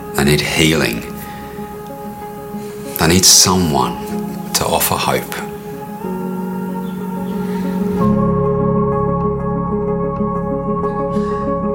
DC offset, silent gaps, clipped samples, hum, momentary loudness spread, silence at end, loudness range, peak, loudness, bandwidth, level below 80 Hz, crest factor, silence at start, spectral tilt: under 0.1%; none; under 0.1%; none; 16 LU; 0 s; 6 LU; 0 dBFS; -16 LUFS; 16.5 kHz; -36 dBFS; 16 dB; 0 s; -3.5 dB/octave